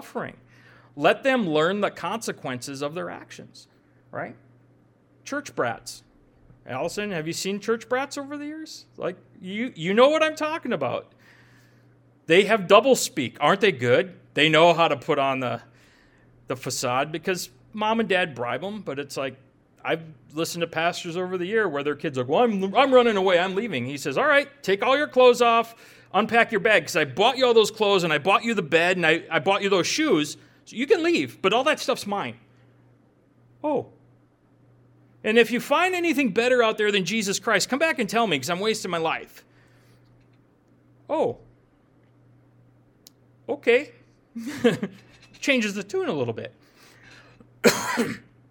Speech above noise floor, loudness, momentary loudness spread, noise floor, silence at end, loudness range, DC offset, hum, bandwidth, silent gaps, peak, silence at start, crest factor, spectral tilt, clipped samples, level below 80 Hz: 36 dB; -23 LUFS; 16 LU; -59 dBFS; 0.3 s; 12 LU; under 0.1%; none; 18.5 kHz; none; 0 dBFS; 0 s; 24 dB; -4 dB/octave; under 0.1%; -68 dBFS